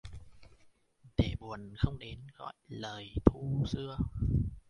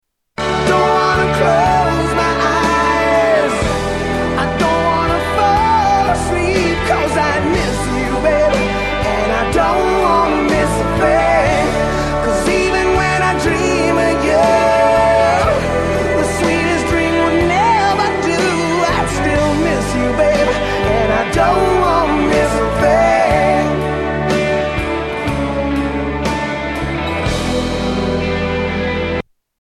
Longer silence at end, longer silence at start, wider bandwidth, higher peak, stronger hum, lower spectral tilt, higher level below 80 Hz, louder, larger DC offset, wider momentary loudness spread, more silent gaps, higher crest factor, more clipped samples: second, 0.1 s vs 0.4 s; second, 0.05 s vs 0.4 s; second, 10.5 kHz vs 14 kHz; second, -4 dBFS vs 0 dBFS; neither; first, -8 dB/octave vs -5 dB/octave; second, -42 dBFS vs -28 dBFS; second, -35 LUFS vs -14 LUFS; neither; first, 18 LU vs 6 LU; neither; first, 30 dB vs 14 dB; neither